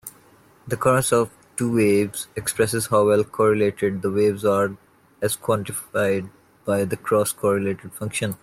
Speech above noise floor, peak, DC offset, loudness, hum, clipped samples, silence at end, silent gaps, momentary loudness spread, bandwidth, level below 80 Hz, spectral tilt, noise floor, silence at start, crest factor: 32 dB; -4 dBFS; under 0.1%; -22 LUFS; none; under 0.1%; 0.1 s; none; 9 LU; 16 kHz; -58 dBFS; -5 dB/octave; -53 dBFS; 0.05 s; 18 dB